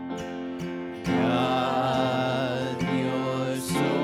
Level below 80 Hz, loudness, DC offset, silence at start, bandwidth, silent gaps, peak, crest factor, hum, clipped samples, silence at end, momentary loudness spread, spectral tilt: -56 dBFS; -27 LUFS; under 0.1%; 0 s; 15.5 kHz; none; -12 dBFS; 14 dB; none; under 0.1%; 0 s; 9 LU; -5.5 dB/octave